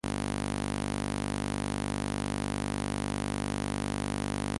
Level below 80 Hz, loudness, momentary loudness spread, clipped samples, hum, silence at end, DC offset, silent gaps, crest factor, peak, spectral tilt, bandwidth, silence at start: -44 dBFS; -33 LUFS; 0 LU; under 0.1%; 50 Hz at -60 dBFS; 0 s; under 0.1%; none; 16 dB; -18 dBFS; -5 dB/octave; 11.5 kHz; 0.05 s